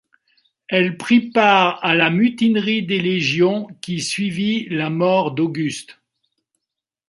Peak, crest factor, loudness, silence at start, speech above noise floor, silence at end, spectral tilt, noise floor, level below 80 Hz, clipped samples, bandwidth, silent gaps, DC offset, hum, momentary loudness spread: -2 dBFS; 18 dB; -18 LUFS; 0.7 s; 65 dB; 1.15 s; -5 dB/octave; -83 dBFS; -64 dBFS; under 0.1%; 11.5 kHz; none; under 0.1%; none; 10 LU